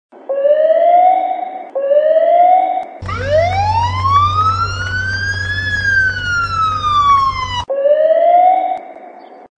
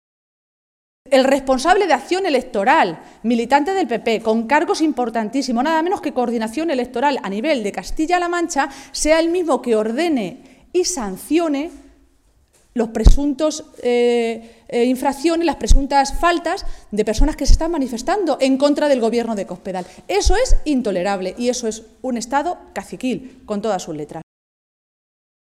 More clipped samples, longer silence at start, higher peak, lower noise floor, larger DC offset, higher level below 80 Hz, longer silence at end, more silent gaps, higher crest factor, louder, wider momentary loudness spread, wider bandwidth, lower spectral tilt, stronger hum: neither; second, 0.15 s vs 1.05 s; about the same, -2 dBFS vs 0 dBFS; second, -36 dBFS vs -56 dBFS; neither; second, -38 dBFS vs -24 dBFS; second, 0.15 s vs 1.4 s; neither; second, 12 dB vs 18 dB; first, -13 LUFS vs -19 LUFS; about the same, 10 LU vs 10 LU; second, 9 kHz vs 14 kHz; about the same, -5 dB/octave vs -4.5 dB/octave; neither